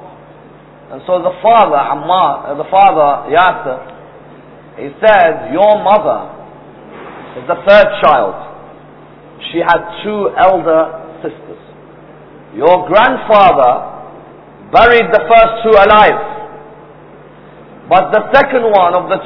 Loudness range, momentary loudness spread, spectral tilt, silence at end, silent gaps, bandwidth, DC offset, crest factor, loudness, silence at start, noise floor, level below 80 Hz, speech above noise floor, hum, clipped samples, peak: 5 LU; 21 LU; -7 dB/octave; 0 s; none; 5.4 kHz; under 0.1%; 12 dB; -10 LUFS; 0 s; -38 dBFS; -42 dBFS; 28 dB; none; 0.7%; 0 dBFS